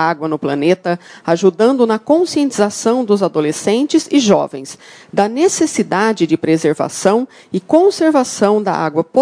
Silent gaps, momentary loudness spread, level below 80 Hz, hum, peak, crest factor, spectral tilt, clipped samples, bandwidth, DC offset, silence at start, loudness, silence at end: none; 7 LU; -60 dBFS; none; 0 dBFS; 14 dB; -5 dB/octave; 0.1%; 10.5 kHz; under 0.1%; 0 s; -15 LUFS; 0 s